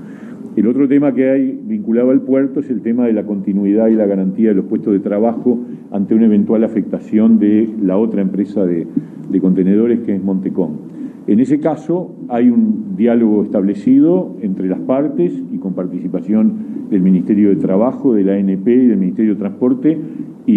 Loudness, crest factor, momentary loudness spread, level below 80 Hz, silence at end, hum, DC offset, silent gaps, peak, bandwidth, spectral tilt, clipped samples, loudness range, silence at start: -15 LUFS; 12 dB; 9 LU; -64 dBFS; 0 s; none; under 0.1%; none; -2 dBFS; 3.7 kHz; -10.5 dB/octave; under 0.1%; 2 LU; 0 s